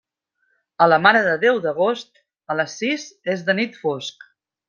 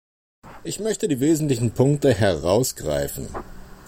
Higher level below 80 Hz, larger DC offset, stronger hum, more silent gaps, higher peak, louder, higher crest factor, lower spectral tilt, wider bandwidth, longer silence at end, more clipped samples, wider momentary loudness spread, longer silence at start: second, -68 dBFS vs -44 dBFS; neither; neither; neither; first, 0 dBFS vs -6 dBFS; first, -19 LUFS vs -22 LUFS; about the same, 20 dB vs 16 dB; about the same, -4.5 dB/octave vs -5.5 dB/octave; second, 7.4 kHz vs 16.5 kHz; first, 0.6 s vs 0.05 s; neither; about the same, 13 LU vs 14 LU; first, 0.8 s vs 0.45 s